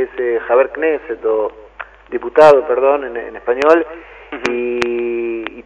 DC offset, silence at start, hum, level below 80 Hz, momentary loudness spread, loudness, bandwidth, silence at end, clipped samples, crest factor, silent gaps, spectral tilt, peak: under 0.1%; 0 s; 50 Hz at -50 dBFS; -50 dBFS; 17 LU; -15 LUFS; 10.5 kHz; 0.05 s; 0.4%; 16 dB; none; -5 dB/octave; 0 dBFS